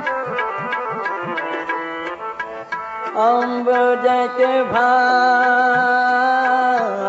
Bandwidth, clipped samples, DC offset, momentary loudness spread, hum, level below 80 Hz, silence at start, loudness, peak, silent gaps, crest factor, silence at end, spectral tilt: 8 kHz; under 0.1%; under 0.1%; 12 LU; none; -66 dBFS; 0 s; -18 LUFS; -4 dBFS; none; 14 dB; 0 s; -4.5 dB/octave